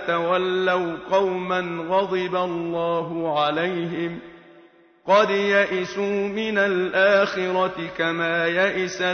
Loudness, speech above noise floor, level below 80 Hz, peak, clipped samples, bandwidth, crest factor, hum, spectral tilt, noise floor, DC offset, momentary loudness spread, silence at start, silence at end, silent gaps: -22 LUFS; 30 dB; -62 dBFS; -4 dBFS; under 0.1%; 6.6 kHz; 18 dB; none; -5 dB/octave; -52 dBFS; under 0.1%; 7 LU; 0 s; 0 s; none